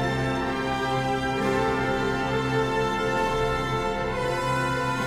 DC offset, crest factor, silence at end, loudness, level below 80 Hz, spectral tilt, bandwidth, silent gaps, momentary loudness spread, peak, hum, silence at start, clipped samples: under 0.1%; 12 dB; 0 s; -25 LUFS; -40 dBFS; -5.5 dB/octave; 16 kHz; none; 2 LU; -12 dBFS; none; 0 s; under 0.1%